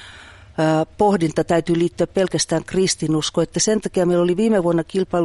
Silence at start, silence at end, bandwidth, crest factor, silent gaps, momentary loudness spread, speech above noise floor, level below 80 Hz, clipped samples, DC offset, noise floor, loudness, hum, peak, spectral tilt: 0 s; 0 s; 11.5 kHz; 14 dB; none; 3 LU; 24 dB; -48 dBFS; under 0.1%; under 0.1%; -42 dBFS; -19 LUFS; none; -4 dBFS; -5 dB/octave